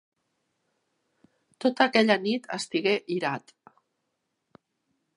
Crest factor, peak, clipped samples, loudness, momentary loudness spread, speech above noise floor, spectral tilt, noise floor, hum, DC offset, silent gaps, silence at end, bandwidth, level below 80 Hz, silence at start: 24 dB; -6 dBFS; under 0.1%; -26 LUFS; 9 LU; 54 dB; -4.5 dB/octave; -80 dBFS; none; under 0.1%; none; 1.8 s; 11 kHz; -80 dBFS; 1.6 s